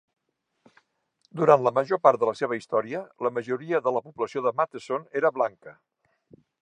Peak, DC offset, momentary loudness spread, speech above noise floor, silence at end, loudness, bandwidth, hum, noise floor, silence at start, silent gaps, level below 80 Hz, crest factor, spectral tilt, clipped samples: -4 dBFS; under 0.1%; 10 LU; 48 dB; 0.95 s; -25 LUFS; 9.6 kHz; none; -73 dBFS; 1.35 s; none; -78 dBFS; 24 dB; -6.5 dB/octave; under 0.1%